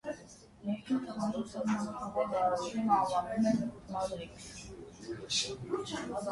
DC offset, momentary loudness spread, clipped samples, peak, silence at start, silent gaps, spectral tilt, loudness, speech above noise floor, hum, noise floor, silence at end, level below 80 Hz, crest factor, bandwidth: under 0.1%; 16 LU; under 0.1%; -16 dBFS; 0.05 s; none; -4.5 dB/octave; -34 LUFS; 21 dB; none; -54 dBFS; 0 s; -62 dBFS; 18 dB; 11.5 kHz